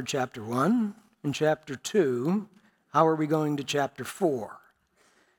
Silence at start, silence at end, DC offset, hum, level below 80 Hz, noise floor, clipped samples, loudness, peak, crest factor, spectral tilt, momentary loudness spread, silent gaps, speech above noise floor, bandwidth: 0 s; 0.8 s; under 0.1%; none; -74 dBFS; -66 dBFS; under 0.1%; -28 LUFS; -8 dBFS; 20 dB; -5.5 dB/octave; 10 LU; none; 39 dB; 18.5 kHz